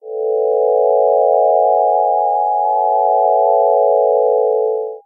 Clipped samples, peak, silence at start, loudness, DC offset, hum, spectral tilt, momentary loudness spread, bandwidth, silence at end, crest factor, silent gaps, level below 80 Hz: under 0.1%; -2 dBFS; 0.05 s; -14 LUFS; under 0.1%; none; -10.5 dB/octave; 3 LU; 1 kHz; 0.05 s; 12 dB; none; under -90 dBFS